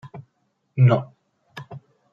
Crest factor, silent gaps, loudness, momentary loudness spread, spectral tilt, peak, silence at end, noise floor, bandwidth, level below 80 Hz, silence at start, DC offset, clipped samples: 18 dB; none; -20 LUFS; 25 LU; -9.5 dB/octave; -6 dBFS; 0.35 s; -71 dBFS; 5.2 kHz; -68 dBFS; 0.05 s; under 0.1%; under 0.1%